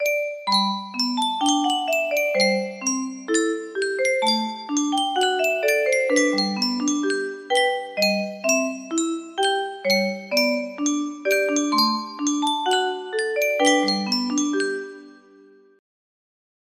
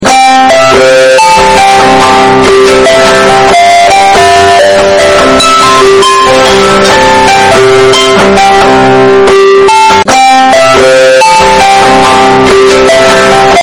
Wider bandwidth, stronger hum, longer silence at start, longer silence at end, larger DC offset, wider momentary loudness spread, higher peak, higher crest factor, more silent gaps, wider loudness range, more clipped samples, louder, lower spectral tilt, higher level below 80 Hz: second, 15.5 kHz vs 18.5 kHz; neither; about the same, 0 s vs 0 s; first, 1.65 s vs 0 s; neither; first, 6 LU vs 1 LU; second, -4 dBFS vs 0 dBFS; first, 18 dB vs 2 dB; neither; about the same, 2 LU vs 0 LU; second, under 0.1% vs 8%; second, -22 LUFS vs -2 LUFS; about the same, -2.5 dB/octave vs -3 dB/octave; second, -72 dBFS vs -28 dBFS